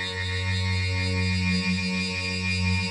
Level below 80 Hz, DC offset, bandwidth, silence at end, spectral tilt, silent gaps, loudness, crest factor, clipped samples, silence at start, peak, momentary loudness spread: -54 dBFS; under 0.1%; 10.5 kHz; 0 s; -4.5 dB/octave; none; -25 LUFS; 14 dB; under 0.1%; 0 s; -12 dBFS; 2 LU